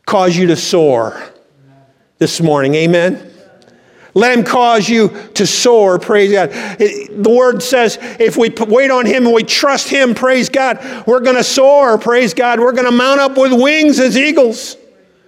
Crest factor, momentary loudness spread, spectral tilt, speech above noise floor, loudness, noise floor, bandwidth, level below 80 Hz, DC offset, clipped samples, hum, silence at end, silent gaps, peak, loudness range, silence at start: 12 dB; 7 LU; -4 dB/octave; 38 dB; -11 LUFS; -48 dBFS; 16 kHz; -62 dBFS; under 0.1%; under 0.1%; none; 0.55 s; none; 0 dBFS; 4 LU; 0.05 s